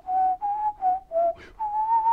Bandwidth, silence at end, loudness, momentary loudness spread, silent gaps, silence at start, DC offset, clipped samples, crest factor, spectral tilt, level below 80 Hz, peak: 4.9 kHz; 0 s; -26 LUFS; 5 LU; none; 0.05 s; under 0.1%; under 0.1%; 10 dB; -6 dB/octave; -56 dBFS; -14 dBFS